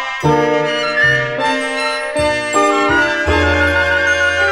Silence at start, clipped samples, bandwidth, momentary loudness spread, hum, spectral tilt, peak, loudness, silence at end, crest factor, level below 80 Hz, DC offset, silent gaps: 0 s; under 0.1%; 13.5 kHz; 4 LU; none; -4 dB/octave; -2 dBFS; -14 LUFS; 0 s; 14 dB; -32 dBFS; under 0.1%; none